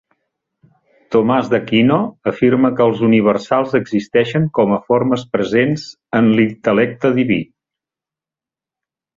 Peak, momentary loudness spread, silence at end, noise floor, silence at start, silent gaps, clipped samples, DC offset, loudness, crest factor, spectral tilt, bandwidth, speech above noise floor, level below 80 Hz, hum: -2 dBFS; 5 LU; 1.75 s; -89 dBFS; 1.1 s; none; under 0.1%; under 0.1%; -15 LUFS; 14 dB; -7.5 dB/octave; 7.6 kHz; 74 dB; -54 dBFS; none